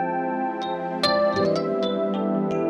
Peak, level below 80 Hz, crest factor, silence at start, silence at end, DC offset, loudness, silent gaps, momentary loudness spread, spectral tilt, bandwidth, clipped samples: -8 dBFS; -60 dBFS; 14 dB; 0 s; 0 s; under 0.1%; -24 LUFS; none; 6 LU; -6 dB/octave; 12 kHz; under 0.1%